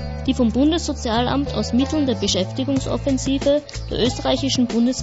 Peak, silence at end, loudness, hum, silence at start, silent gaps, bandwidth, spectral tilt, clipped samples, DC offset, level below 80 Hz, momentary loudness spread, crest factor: -6 dBFS; 0 s; -20 LUFS; none; 0 s; none; 8 kHz; -5 dB/octave; under 0.1%; under 0.1%; -34 dBFS; 4 LU; 14 dB